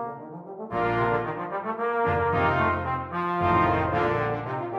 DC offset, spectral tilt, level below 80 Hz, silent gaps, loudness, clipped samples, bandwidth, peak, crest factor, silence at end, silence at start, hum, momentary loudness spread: under 0.1%; -8.5 dB/octave; -48 dBFS; none; -25 LUFS; under 0.1%; 7.4 kHz; -10 dBFS; 16 dB; 0 s; 0 s; none; 10 LU